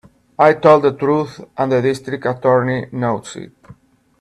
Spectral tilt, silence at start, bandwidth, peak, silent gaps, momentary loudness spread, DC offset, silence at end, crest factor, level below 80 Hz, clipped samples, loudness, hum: -7 dB/octave; 0.4 s; 12 kHz; 0 dBFS; none; 15 LU; under 0.1%; 0.75 s; 16 dB; -56 dBFS; under 0.1%; -16 LUFS; none